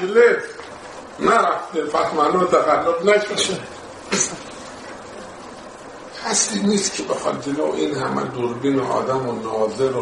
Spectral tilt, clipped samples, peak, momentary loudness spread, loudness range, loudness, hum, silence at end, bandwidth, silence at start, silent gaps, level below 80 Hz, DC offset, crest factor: -3.5 dB/octave; under 0.1%; -2 dBFS; 19 LU; 5 LU; -20 LUFS; none; 0 s; 11.5 kHz; 0 s; none; -58 dBFS; under 0.1%; 18 dB